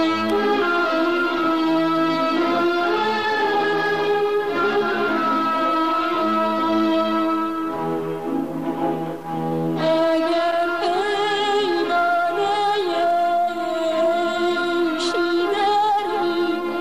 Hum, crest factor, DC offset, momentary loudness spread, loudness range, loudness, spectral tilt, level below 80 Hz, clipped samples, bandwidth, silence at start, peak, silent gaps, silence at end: none; 10 dB; 0.6%; 5 LU; 3 LU; -20 LUFS; -5 dB/octave; -60 dBFS; under 0.1%; 15 kHz; 0 s; -10 dBFS; none; 0 s